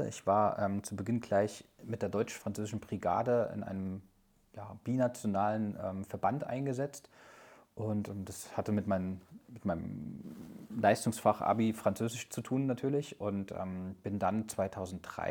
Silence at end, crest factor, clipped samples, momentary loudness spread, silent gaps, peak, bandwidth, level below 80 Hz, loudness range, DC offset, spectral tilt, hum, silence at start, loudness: 0 s; 22 dB; under 0.1%; 14 LU; none; -12 dBFS; 19.5 kHz; -66 dBFS; 5 LU; under 0.1%; -6.5 dB/octave; none; 0 s; -35 LUFS